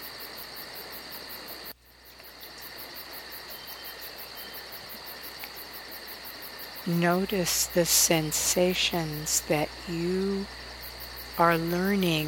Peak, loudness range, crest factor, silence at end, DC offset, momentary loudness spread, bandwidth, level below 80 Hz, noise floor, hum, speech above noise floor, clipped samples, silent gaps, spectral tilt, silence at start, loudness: -8 dBFS; 15 LU; 22 dB; 0 s; under 0.1%; 16 LU; 18 kHz; -54 dBFS; -52 dBFS; none; 26 dB; under 0.1%; none; -3 dB/octave; 0 s; -28 LUFS